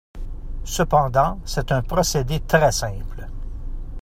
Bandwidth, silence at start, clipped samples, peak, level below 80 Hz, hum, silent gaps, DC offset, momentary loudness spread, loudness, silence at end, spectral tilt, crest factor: 16 kHz; 0.15 s; under 0.1%; -2 dBFS; -30 dBFS; none; none; under 0.1%; 19 LU; -21 LUFS; 0 s; -4.5 dB/octave; 20 dB